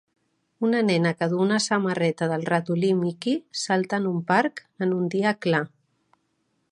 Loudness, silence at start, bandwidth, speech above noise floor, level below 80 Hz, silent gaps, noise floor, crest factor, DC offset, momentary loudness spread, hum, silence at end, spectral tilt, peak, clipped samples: -24 LUFS; 0.6 s; 11 kHz; 49 dB; -74 dBFS; none; -72 dBFS; 18 dB; under 0.1%; 5 LU; none; 1.05 s; -5.5 dB/octave; -6 dBFS; under 0.1%